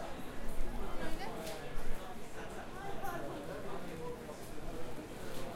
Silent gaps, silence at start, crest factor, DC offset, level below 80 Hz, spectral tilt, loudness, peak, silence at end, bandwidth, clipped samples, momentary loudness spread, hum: none; 0 s; 16 dB; under 0.1%; -44 dBFS; -5 dB/octave; -45 LUFS; -20 dBFS; 0 s; 15 kHz; under 0.1%; 4 LU; none